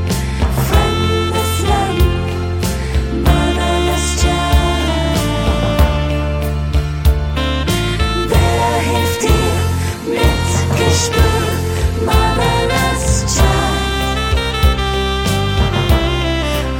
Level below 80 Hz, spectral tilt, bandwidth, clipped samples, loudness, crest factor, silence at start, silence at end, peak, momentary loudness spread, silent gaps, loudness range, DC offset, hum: -18 dBFS; -5 dB/octave; 17 kHz; under 0.1%; -15 LUFS; 14 dB; 0 s; 0 s; 0 dBFS; 4 LU; none; 1 LU; under 0.1%; none